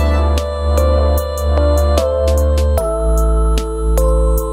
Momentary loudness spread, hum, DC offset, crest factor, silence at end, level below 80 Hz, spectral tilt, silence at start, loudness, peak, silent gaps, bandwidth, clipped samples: 4 LU; none; under 0.1%; 12 dB; 0 s; -14 dBFS; -6.5 dB/octave; 0 s; -15 LUFS; 0 dBFS; none; 16 kHz; under 0.1%